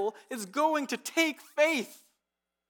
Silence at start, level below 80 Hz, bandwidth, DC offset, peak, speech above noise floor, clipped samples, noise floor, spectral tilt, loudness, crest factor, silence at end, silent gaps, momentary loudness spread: 0 s; under -90 dBFS; 19 kHz; under 0.1%; -12 dBFS; 57 dB; under 0.1%; -87 dBFS; -2.5 dB/octave; -29 LUFS; 20 dB; 0.75 s; none; 9 LU